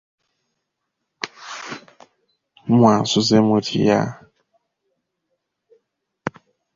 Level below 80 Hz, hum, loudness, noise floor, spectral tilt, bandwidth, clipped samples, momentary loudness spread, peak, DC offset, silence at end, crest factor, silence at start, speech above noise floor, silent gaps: -58 dBFS; none; -17 LUFS; -78 dBFS; -5.5 dB/octave; 7.6 kHz; under 0.1%; 19 LU; -2 dBFS; under 0.1%; 0.45 s; 20 dB; 1.25 s; 62 dB; none